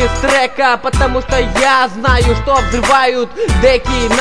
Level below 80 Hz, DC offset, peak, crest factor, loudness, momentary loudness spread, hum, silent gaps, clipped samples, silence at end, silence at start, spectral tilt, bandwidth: -20 dBFS; 3%; 0 dBFS; 12 dB; -12 LUFS; 4 LU; none; none; under 0.1%; 0 s; 0 s; -4.5 dB/octave; 11 kHz